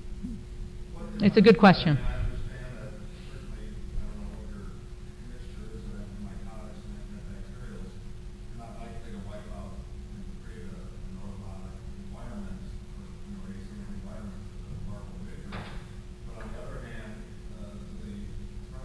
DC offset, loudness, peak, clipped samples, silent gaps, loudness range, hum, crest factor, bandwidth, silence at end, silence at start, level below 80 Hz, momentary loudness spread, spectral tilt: under 0.1%; -29 LUFS; -6 dBFS; under 0.1%; none; 19 LU; none; 26 dB; 11 kHz; 0 s; 0 s; -40 dBFS; 17 LU; -7.5 dB/octave